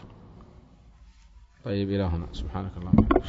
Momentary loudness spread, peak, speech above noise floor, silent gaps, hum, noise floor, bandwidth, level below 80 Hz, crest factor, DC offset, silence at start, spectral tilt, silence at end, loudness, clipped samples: 26 LU; -4 dBFS; 28 dB; none; none; -53 dBFS; 7.6 kHz; -38 dBFS; 24 dB; under 0.1%; 0 s; -9 dB/octave; 0 s; -28 LUFS; under 0.1%